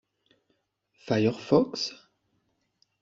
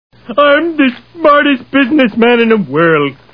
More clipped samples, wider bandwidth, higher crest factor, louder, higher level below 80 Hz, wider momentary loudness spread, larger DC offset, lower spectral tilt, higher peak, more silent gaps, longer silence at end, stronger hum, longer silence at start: second, under 0.1% vs 0.3%; first, 7.8 kHz vs 5.4 kHz; first, 22 dB vs 10 dB; second, -27 LUFS vs -10 LUFS; second, -66 dBFS vs -50 dBFS; first, 9 LU vs 5 LU; second, under 0.1% vs 0.4%; second, -6 dB/octave vs -8.5 dB/octave; second, -8 dBFS vs 0 dBFS; neither; first, 1.1 s vs 0.2 s; neither; first, 1.05 s vs 0.3 s